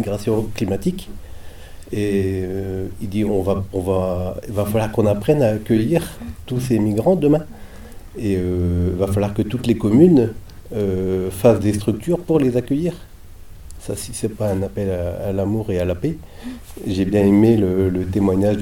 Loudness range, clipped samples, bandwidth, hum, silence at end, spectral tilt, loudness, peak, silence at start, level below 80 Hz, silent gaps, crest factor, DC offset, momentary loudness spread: 6 LU; under 0.1%; 18.5 kHz; none; 0 s; -7.5 dB/octave; -19 LUFS; 0 dBFS; 0 s; -38 dBFS; none; 18 dB; under 0.1%; 15 LU